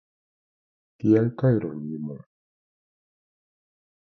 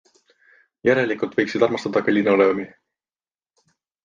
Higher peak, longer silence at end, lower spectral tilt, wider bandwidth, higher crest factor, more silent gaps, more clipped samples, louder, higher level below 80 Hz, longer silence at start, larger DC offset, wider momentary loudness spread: second, -8 dBFS vs -4 dBFS; first, 1.9 s vs 1.4 s; first, -11 dB/octave vs -6.5 dB/octave; second, 6.2 kHz vs 7.4 kHz; about the same, 20 dB vs 18 dB; neither; neither; second, -24 LUFS vs -20 LUFS; about the same, -62 dBFS vs -64 dBFS; first, 1.05 s vs 0.85 s; neither; first, 15 LU vs 7 LU